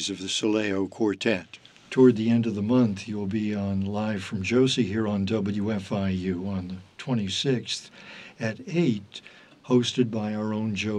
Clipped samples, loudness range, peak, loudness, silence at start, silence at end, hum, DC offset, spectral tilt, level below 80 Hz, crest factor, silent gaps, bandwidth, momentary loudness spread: under 0.1%; 5 LU; -8 dBFS; -26 LUFS; 0 s; 0 s; none; under 0.1%; -5.5 dB/octave; -66 dBFS; 18 dB; none; 10.5 kHz; 11 LU